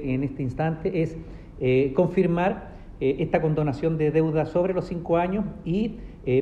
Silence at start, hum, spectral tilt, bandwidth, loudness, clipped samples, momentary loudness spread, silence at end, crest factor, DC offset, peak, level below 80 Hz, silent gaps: 0 s; none; -9.5 dB/octave; 8 kHz; -25 LUFS; under 0.1%; 8 LU; 0 s; 18 dB; under 0.1%; -6 dBFS; -44 dBFS; none